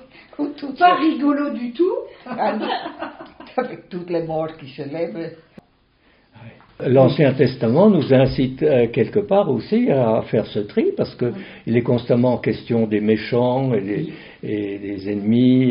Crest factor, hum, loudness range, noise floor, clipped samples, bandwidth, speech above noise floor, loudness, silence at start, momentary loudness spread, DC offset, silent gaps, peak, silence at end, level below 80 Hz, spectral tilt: 18 dB; none; 10 LU; -58 dBFS; under 0.1%; 5.4 kHz; 39 dB; -19 LUFS; 0.4 s; 14 LU; under 0.1%; none; -2 dBFS; 0 s; -50 dBFS; -6.5 dB/octave